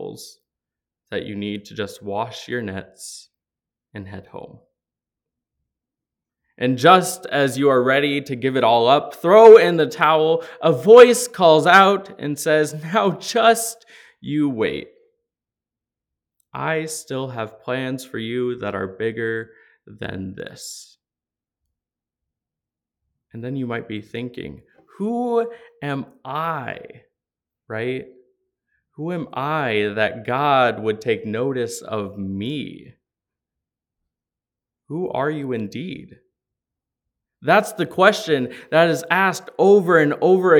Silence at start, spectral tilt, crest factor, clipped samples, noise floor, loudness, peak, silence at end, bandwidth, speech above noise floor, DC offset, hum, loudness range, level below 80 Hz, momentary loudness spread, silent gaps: 0 s; -4.5 dB/octave; 20 dB; under 0.1%; -89 dBFS; -18 LUFS; 0 dBFS; 0 s; 18.5 kHz; 71 dB; under 0.1%; none; 19 LU; -66 dBFS; 20 LU; none